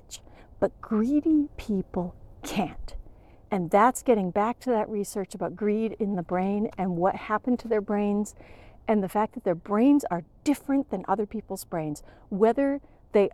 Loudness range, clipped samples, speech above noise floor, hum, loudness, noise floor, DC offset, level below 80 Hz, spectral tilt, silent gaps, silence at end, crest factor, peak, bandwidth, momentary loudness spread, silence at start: 2 LU; under 0.1%; 24 dB; none; -27 LUFS; -50 dBFS; under 0.1%; -50 dBFS; -6.5 dB/octave; none; 0.05 s; 18 dB; -8 dBFS; 14.5 kHz; 13 LU; 0.1 s